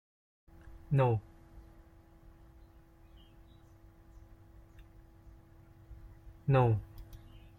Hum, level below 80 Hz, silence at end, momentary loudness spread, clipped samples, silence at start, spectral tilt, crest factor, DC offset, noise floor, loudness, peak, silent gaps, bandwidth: none; -56 dBFS; 0.4 s; 29 LU; under 0.1%; 0.65 s; -9.5 dB/octave; 24 dB; under 0.1%; -59 dBFS; -31 LUFS; -14 dBFS; none; 4.2 kHz